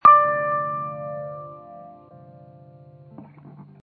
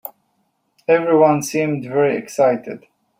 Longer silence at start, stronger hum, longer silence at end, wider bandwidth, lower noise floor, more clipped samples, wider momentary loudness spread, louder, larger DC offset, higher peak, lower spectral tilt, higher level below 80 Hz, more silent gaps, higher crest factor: about the same, 0.05 s vs 0.05 s; neither; second, 0.2 s vs 0.4 s; second, 4.5 kHz vs 16 kHz; second, -47 dBFS vs -67 dBFS; neither; first, 28 LU vs 19 LU; second, -22 LUFS vs -17 LUFS; neither; about the same, -2 dBFS vs -2 dBFS; first, -9 dB/octave vs -6 dB/octave; about the same, -68 dBFS vs -64 dBFS; neither; about the same, 20 dB vs 16 dB